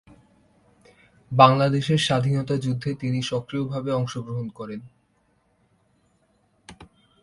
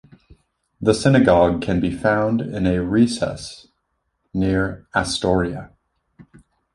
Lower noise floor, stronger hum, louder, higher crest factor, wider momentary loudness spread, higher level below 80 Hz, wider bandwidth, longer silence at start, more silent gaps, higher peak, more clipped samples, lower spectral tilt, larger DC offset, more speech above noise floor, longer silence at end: second, -66 dBFS vs -72 dBFS; neither; second, -23 LUFS vs -19 LUFS; first, 24 dB vs 18 dB; first, 16 LU vs 12 LU; second, -58 dBFS vs -40 dBFS; about the same, 11.5 kHz vs 11.5 kHz; first, 1.3 s vs 0.8 s; neither; about the same, 0 dBFS vs -2 dBFS; neither; about the same, -6 dB/octave vs -6 dB/octave; neither; second, 44 dB vs 54 dB; second, 0.4 s vs 0.55 s